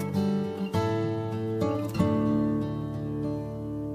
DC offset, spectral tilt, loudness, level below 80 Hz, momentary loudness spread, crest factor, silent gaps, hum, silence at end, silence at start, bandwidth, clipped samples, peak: under 0.1%; -8 dB/octave; -29 LUFS; -50 dBFS; 7 LU; 16 dB; none; none; 0 s; 0 s; 15 kHz; under 0.1%; -12 dBFS